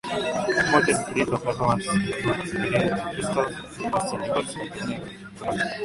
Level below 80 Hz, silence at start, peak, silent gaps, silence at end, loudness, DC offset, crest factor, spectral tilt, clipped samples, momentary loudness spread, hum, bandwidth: -50 dBFS; 0.05 s; -2 dBFS; none; 0 s; -25 LUFS; under 0.1%; 22 dB; -4.5 dB/octave; under 0.1%; 12 LU; none; 11.5 kHz